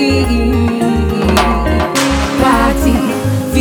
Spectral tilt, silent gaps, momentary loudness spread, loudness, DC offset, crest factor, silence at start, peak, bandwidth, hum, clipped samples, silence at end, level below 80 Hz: -5.5 dB/octave; none; 3 LU; -13 LUFS; under 0.1%; 12 dB; 0 s; 0 dBFS; 19.5 kHz; none; under 0.1%; 0 s; -20 dBFS